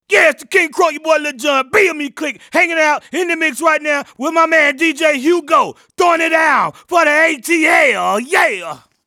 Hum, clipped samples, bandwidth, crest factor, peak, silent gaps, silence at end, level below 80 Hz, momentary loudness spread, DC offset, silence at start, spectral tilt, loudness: none; under 0.1%; 18 kHz; 14 dB; 0 dBFS; none; 0.3 s; -64 dBFS; 7 LU; under 0.1%; 0.1 s; -2 dB/octave; -13 LUFS